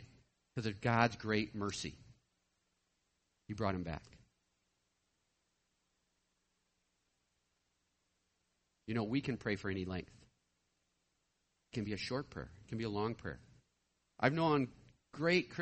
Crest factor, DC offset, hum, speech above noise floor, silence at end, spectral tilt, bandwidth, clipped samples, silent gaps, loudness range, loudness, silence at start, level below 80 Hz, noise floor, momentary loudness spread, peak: 26 dB; under 0.1%; none; 45 dB; 0 s; -6 dB/octave; 8.4 kHz; under 0.1%; none; 8 LU; -38 LUFS; 0 s; -66 dBFS; -82 dBFS; 16 LU; -16 dBFS